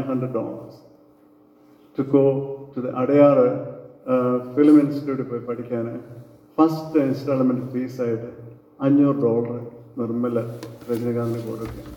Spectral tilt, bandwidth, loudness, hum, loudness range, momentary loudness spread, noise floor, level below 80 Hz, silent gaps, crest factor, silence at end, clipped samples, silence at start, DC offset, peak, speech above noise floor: -9 dB/octave; 16.5 kHz; -21 LUFS; none; 5 LU; 18 LU; -53 dBFS; -58 dBFS; none; 18 dB; 0 s; under 0.1%; 0 s; under 0.1%; -4 dBFS; 33 dB